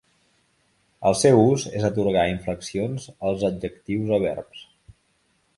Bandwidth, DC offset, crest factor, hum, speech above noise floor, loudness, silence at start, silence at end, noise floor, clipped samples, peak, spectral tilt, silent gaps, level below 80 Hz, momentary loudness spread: 11.5 kHz; under 0.1%; 20 dB; none; 45 dB; -23 LUFS; 1 s; 0.95 s; -67 dBFS; under 0.1%; -4 dBFS; -6 dB/octave; none; -50 dBFS; 13 LU